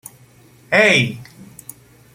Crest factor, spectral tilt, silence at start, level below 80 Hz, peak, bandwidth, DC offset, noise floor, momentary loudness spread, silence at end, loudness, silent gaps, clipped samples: 20 dB; -4 dB/octave; 0.7 s; -58 dBFS; 0 dBFS; 16.5 kHz; under 0.1%; -48 dBFS; 25 LU; 0.9 s; -14 LUFS; none; under 0.1%